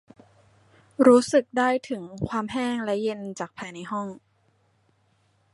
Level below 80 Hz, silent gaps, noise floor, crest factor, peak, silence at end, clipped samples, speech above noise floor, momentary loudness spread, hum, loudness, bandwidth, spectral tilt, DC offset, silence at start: -60 dBFS; none; -66 dBFS; 22 dB; -4 dBFS; 1.4 s; under 0.1%; 42 dB; 17 LU; none; -24 LUFS; 11.5 kHz; -5.5 dB/octave; under 0.1%; 1 s